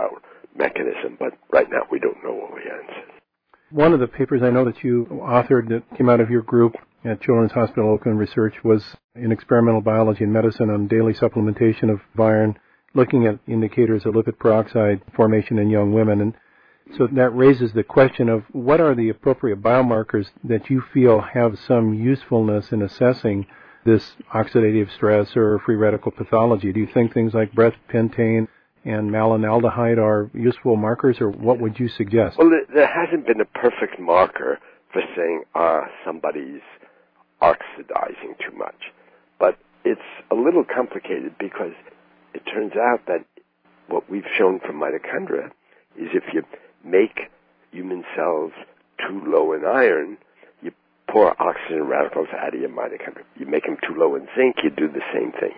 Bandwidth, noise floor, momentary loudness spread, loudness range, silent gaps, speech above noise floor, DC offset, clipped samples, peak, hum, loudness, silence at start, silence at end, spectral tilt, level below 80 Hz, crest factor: 5.4 kHz; -60 dBFS; 13 LU; 6 LU; 9.04-9.09 s; 41 dB; under 0.1%; under 0.1%; -4 dBFS; none; -20 LUFS; 0 s; 0.05 s; -10.5 dB/octave; -56 dBFS; 16 dB